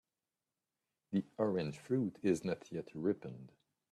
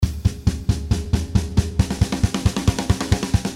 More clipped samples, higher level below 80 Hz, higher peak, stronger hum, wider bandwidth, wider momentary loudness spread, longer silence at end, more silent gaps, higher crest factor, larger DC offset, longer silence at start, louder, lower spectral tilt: neither; second, -76 dBFS vs -26 dBFS; second, -20 dBFS vs -4 dBFS; neither; second, 12.5 kHz vs 15 kHz; first, 9 LU vs 2 LU; first, 0.45 s vs 0 s; neither; about the same, 20 dB vs 16 dB; neither; first, 1.1 s vs 0 s; second, -38 LUFS vs -22 LUFS; about the same, -7 dB/octave vs -6 dB/octave